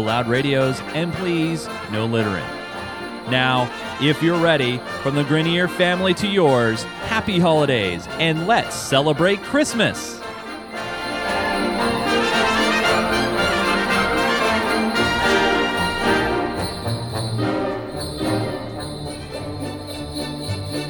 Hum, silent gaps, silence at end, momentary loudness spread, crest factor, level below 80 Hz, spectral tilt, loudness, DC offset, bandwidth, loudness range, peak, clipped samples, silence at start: none; none; 0 s; 12 LU; 18 dB; -44 dBFS; -5 dB/octave; -20 LUFS; under 0.1%; over 20 kHz; 5 LU; -2 dBFS; under 0.1%; 0 s